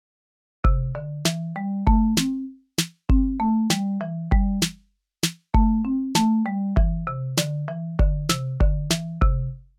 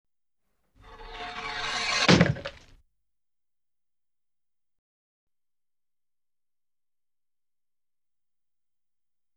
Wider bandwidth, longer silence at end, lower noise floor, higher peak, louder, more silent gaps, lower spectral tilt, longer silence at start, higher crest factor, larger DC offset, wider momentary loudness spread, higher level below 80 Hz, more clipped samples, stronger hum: first, 16 kHz vs 10.5 kHz; second, 0.15 s vs 6.85 s; second, -55 dBFS vs under -90 dBFS; about the same, -6 dBFS vs -6 dBFS; about the same, -24 LUFS vs -24 LUFS; neither; about the same, -5 dB/octave vs -4.5 dB/octave; second, 0.65 s vs 0.85 s; second, 16 dB vs 28 dB; neither; second, 8 LU vs 21 LU; first, -26 dBFS vs -56 dBFS; neither; neither